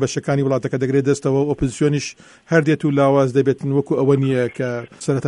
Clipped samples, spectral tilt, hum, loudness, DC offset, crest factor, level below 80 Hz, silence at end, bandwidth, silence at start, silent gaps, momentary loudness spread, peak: under 0.1%; -6.5 dB/octave; none; -18 LUFS; under 0.1%; 16 dB; -46 dBFS; 0 s; 11 kHz; 0 s; none; 8 LU; -2 dBFS